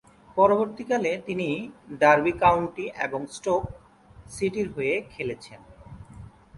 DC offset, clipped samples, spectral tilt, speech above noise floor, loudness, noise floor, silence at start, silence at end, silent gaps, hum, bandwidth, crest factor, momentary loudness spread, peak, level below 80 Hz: under 0.1%; under 0.1%; -5.5 dB/octave; 21 dB; -25 LUFS; -46 dBFS; 0.35 s; 0 s; none; none; 11.5 kHz; 20 dB; 20 LU; -6 dBFS; -52 dBFS